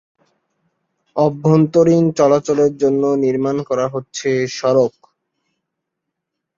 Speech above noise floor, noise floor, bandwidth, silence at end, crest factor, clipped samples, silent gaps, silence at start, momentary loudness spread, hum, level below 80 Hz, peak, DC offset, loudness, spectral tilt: 63 dB; -79 dBFS; 7.6 kHz; 1.7 s; 16 dB; under 0.1%; none; 1.15 s; 7 LU; none; -58 dBFS; -2 dBFS; under 0.1%; -16 LUFS; -7 dB/octave